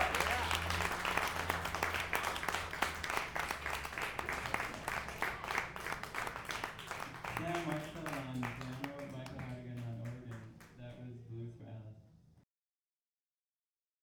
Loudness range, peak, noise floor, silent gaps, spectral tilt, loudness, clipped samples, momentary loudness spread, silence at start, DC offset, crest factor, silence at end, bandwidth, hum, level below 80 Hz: 14 LU; -14 dBFS; under -90 dBFS; none; -3.5 dB/octave; -39 LUFS; under 0.1%; 14 LU; 0 s; under 0.1%; 26 dB; 1.6 s; over 20 kHz; none; -56 dBFS